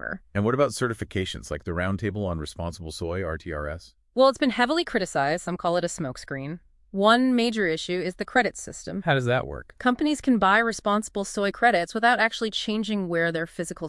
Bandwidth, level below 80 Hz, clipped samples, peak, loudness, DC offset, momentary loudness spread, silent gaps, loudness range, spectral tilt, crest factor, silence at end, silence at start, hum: 12 kHz; -50 dBFS; under 0.1%; -6 dBFS; -25 LUFS; under 0.1%; 13 LU; none; 5 LU; -5 dB/octave; 20 dB; 0 s; 0 s; none